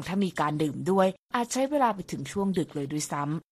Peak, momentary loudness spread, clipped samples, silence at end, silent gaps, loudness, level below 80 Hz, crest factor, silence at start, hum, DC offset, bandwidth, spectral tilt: -10 dBFS; 7 LU; under 0.1%; 0.1 s; 1.19-1.29 s; -28 LUFS; -62 dBFS; 18 dB; 0 s; none; under 0.1%; 14.5 kHz; -5.5 dB/octave